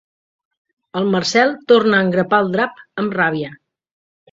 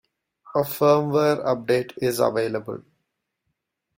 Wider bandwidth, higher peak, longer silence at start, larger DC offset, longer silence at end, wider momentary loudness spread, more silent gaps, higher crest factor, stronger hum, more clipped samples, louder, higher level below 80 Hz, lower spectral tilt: second, 7.8 kHz vs 16.5 kHz; first, 0 dBFS vs -6 dBFS; first, 0.95 s vs 0.45 s; neither; second, 0.75 s vs 1.2 s; about the same, 11 LU vs 10 LU; neither; about the same, 18 dB vs 18 dB; neither; neither; first, -16 LUFS vs -22 LUFS; about the same, -60 dBFS vs -64 dBFS; about the same, -5 dB/octave vs -6 dB/octave